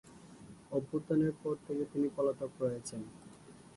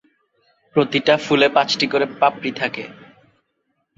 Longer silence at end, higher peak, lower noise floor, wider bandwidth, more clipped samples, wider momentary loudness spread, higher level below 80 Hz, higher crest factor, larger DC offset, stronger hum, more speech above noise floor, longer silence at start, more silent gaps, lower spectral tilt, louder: second, 0.1 s vs 1.05 s; second, -20 dBFS vs -2 dBFS; second, -55 dBFS vs -71 dBFS; first, 11.5 kHz vs 7.8 kHz; neither; first, 22 LU vs 9 LU; second, -70 dBFS vs -64 dBFS; about the same, 16 dB vs 18 dB; neither; neither; second, 20 dB vs 53 dB; second, 0.05 s vs 0.75 s; neither; first, -7 dB/octave vs -4.5 dB/octave; second, -36 LUFS vs -18 LUFS